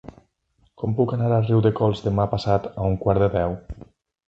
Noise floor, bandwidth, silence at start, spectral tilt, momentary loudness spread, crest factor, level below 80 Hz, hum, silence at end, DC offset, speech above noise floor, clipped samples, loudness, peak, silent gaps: -65 dBFS; 7.6 kHz; 0.05 s; -9 dB/octave; 11 LU; 18 dB; -42 dBFS; none; 0.5 s; under 0.1%; 44 dB; under 0.1%; -22 LUFS; -4 dBFS; none